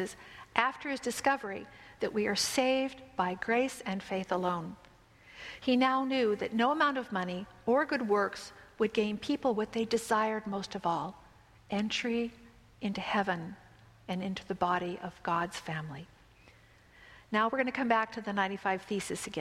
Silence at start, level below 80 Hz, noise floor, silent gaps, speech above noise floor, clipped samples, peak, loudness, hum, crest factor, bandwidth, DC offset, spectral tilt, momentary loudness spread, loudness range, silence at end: 0 s; -66 dBFS; -60 dBFS; none; 28 dB; under 0.1%; -6 dBFS; -32 LUFS; none; 26 dB; 15.5 kHz; under 0.1%; -4 dB/octave; 11 LU; 5 LU; 0 s